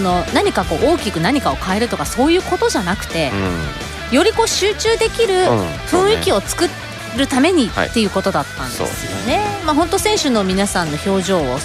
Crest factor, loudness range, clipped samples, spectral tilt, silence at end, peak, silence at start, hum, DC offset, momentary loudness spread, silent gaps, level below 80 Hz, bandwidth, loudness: 14 dB; 2 LU; under 0.1%; -4 dB/octave; 0 s; -2 dBFS; 0 s; none; under 0.1%; 7 LU; none; -34 dBFS; 16 kHz; -16 LUFS